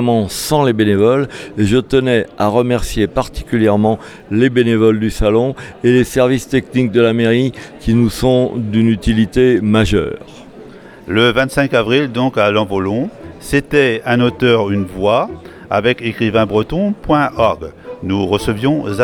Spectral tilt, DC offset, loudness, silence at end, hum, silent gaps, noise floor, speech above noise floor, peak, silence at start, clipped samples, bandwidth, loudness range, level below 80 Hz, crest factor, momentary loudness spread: -6 dB/octave; under 0.1%; -14 LUFS; 0 s; none; none; -36 dBFS; 22 dB; 0 dBFS; 0 s; under 0.1%; 17 kHz; 2 LU; -32 dBFS; 14 dB; 8 LU